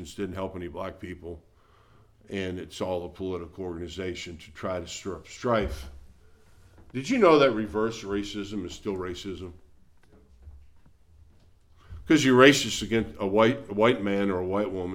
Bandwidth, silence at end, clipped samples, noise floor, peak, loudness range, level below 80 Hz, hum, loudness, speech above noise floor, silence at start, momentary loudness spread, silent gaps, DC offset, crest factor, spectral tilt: 16.5 kHz; 0 s; under 0.1%; -58 dBFS; -2 dBFS; 13 LU; -50 dBFS; none; -26 LUFS; 32 dB; 0 s; 19 LU; none; under 0.1%; 24 dB; -5 dB/octave